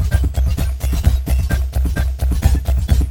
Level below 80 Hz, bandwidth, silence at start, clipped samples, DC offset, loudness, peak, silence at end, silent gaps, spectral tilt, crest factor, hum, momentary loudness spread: -16 dBFS; 17 kHz; 0 s; under 0.1%; 0.6%; -18 LUFS; 0 dBFS; 0 s; none; -6 dB/octave; 14 dB; none; 3 LU